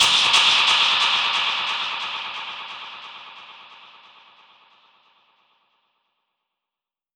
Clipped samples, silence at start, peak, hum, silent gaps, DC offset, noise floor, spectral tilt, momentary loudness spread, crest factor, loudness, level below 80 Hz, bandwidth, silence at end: under 0.1%; 0 s; -4 dBFS; none; none; under 0.1%; -89 dBFS; 1.5 dB/octave; 24 LU; 20 dB; -17 LUFS; -70 dBFS; over 20 kHz; 3.4 s